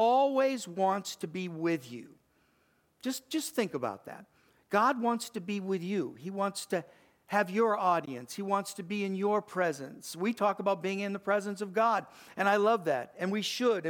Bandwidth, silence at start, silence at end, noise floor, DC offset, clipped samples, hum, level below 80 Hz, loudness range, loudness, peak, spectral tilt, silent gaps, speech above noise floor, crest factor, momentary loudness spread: 19 kHz; 0 s; 0 s; -71 dBFS; under 0.1%; under 0.1%; none; -82 dBFS; 5 LU; -31 LUFS; -12 dBFS; -4.5 dB/octave; none; 39 dB; 20 dB; 11 LU